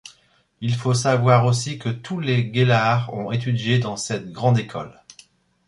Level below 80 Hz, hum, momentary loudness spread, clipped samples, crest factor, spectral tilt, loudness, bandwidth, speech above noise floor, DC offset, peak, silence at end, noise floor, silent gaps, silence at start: -56 dBFS; none; 11 LU; under 0.1%; 18 dB; -5.5 dB/octave; -21 LUFS; 11.5 kHz; 38 dB; under 0.1%; -2 dBFS; 0.75 s; -58 dBFS; none; 0.05 s